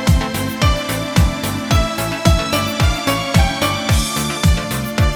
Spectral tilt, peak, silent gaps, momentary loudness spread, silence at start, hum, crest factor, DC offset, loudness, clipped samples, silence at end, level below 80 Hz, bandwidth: -4.5 dB/octave; -2 dBFS; none; 4 LU; 0 s; none; 14 dB; under 0.1%; -17 LUFS; under 0.1%; 0 s; -22 dBFS; over 20 kHz